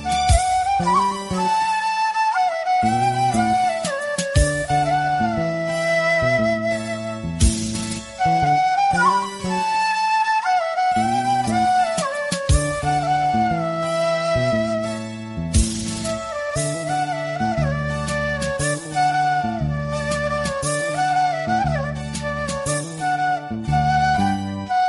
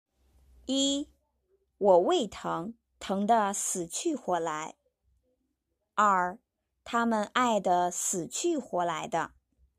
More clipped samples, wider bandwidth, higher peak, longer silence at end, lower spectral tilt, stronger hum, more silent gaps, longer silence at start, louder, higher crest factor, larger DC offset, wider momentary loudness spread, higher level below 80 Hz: neither; second, 11.5 kHz vs 14.5 kHz; first, -4 dBFS vs -10 dBFS; second, 0 s vs 0.5 s; first, -4.5 dB/octave vs -3 dB/octave; neither; neither; second, 0 s vs 0.7 s; first, -20 LUFS vs -29 LUFS; about the same, 16 dB vs 20 dB; neither; second, 7 LU vs 12 LU; first, -32 dBFS vs -66 dBFS